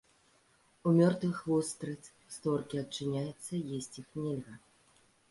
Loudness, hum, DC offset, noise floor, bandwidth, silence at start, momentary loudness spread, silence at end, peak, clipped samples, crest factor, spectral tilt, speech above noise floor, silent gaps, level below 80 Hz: -34 LUFS; none; under 0.1%; -68 dBFS; 11.5 kHz; 0.85 s; 16 LU; 0.75 s; -14 dBFS; under 0.1%; 20 dB; -6.5 dB/octave; 35 dB; none; -72 dBFS